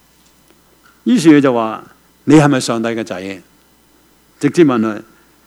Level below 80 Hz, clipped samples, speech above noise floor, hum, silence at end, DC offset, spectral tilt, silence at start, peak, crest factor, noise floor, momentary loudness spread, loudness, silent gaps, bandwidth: -54 dBFS; 0.2%; 39 dB; none; 0.45 s; under 0.1%; -6 dB/octave; 1.05 s; 0 dBFS; 16 dB; -51 dBFS; 18 LU; -13 LUFS; none; 13 kHz